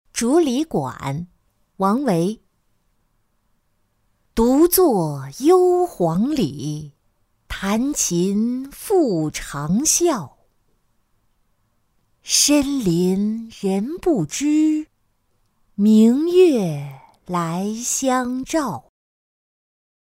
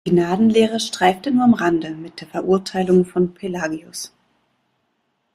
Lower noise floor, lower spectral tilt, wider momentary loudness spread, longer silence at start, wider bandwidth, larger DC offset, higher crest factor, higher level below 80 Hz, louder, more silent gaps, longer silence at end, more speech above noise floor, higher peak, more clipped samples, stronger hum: second, -66 dBFS vs -70 dBFS; about the same, -4.5 dB/octave vs -5.5 dB/octave; about the same, 14 LU vs 15 LU; about the same, 0.15 s vs 0.05 s; first, 16 kHz vs 13.5 kHz; neither; about the same, 18 dB vs 16 dB; first, -48 dBFS vs -56 dBFS; about the same, -19 LUFS vs -18 LUFS; neither; about the same, 1.25 s vs 1.25 s; second, 47 dB vs 51 dB; about the same, -4 dBFS vs -2 dBFS; neither; neither